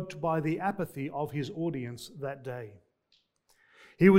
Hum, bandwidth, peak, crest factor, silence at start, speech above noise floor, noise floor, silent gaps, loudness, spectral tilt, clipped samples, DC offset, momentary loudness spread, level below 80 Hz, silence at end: none; 16 kHz; -8 dBFS; 22 dB; 0 s; 38 dB; -72 dBFS; none; -33 LUFS; -8 dB/octave; under 0.1%; under 0.1%; 11 LU; -66 dBFS; 0 s